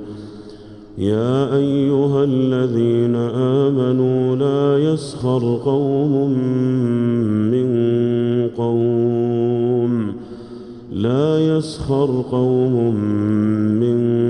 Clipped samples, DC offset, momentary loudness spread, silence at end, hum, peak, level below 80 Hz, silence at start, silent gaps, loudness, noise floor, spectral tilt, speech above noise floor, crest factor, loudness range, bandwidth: under 0.1%; under 0.1%; 7 LU; 0 s; none; -6 dBFS; -50 dBFS; 0 s; none; -18 LUFS; -37 dBFS; -9 dB/octave; 21 dB; 12 dB; 2 LU; 10.5 kHz